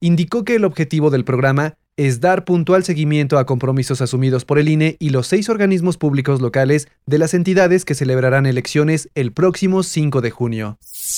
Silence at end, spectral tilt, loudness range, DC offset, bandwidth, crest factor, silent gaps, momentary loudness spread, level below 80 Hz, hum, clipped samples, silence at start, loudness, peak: 0 s; -6.5 dB/octave; 1 LU; under 0.1%; 17.5 kHz; 12 dB; none; 5 LU; -52 dBFS; none; under 0.1%; 0 s; -16 LUFS; -2 dBFS